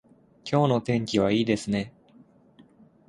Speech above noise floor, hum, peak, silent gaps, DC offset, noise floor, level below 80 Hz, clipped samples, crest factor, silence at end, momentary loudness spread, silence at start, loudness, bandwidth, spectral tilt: 32 dB; none; -8 dBFS; none; under 0.1%; -56 dBFS; -58 dBFS; under 0.1%; 20 dB; 1.2 s; 10 LU; 0.45 s; -25 LUFS; 11.5 kHz; -6.5 dB/octave